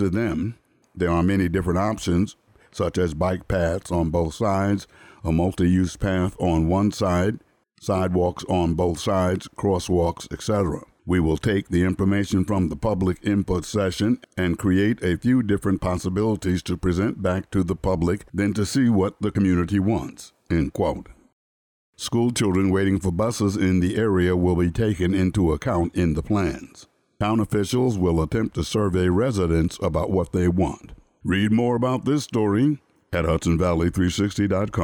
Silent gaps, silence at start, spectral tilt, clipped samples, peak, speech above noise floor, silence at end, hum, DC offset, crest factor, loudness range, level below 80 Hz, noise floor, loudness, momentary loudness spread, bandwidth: 21.33-21.93 s; 0 s; -6.5 dB/octave; under 0.1%; -10 dBFS; over 68 dB; 0 s; none; under 0.1%; 12 dB; 2 LU; -40 dBFS; under -90 dBFS; -23 LUFS; 5 LU; 18 kHz